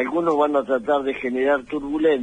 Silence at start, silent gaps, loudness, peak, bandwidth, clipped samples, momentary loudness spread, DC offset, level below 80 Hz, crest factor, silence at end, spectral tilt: 0 s; none; -21 LUFS; -8 dBFS; 9.6 kHz; under 0.1%; 4 LU; under 0.1%; -54 dBFS; 12 dB; 0 s; -6 dB/octave